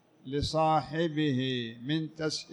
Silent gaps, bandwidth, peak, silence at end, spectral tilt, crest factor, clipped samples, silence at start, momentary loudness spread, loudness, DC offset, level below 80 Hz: none; 11.5 kHz; -16 dBFS; 0 s; -5.5 dB/octave; 14 dB; under 0.1%; 0.25 s; 7 LU; -31 LUFS; under 0.1%; -54 dBFS